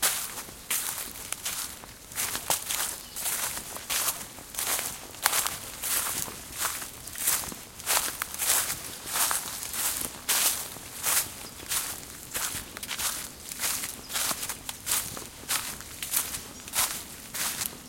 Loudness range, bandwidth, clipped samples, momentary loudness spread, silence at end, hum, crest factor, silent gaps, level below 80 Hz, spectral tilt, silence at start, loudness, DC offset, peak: 4 LU; 17 kHz; under 0.1%; 11 LU; 0 s; none; 30 dB; none; -56 dBFS; 0.5 dB/octave; 0 s; -29 LUFS; under 0.1%; -2 dBFS